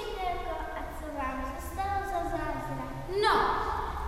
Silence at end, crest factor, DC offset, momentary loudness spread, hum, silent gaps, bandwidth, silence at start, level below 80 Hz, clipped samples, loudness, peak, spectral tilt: 0 s; 18 dB; under 0.1%; 11 LU; none; none; 16 kHz; 0 s; -42 dBFS; under 0.1%; -32 LUFS; -14 dBFS; -5 dB/octave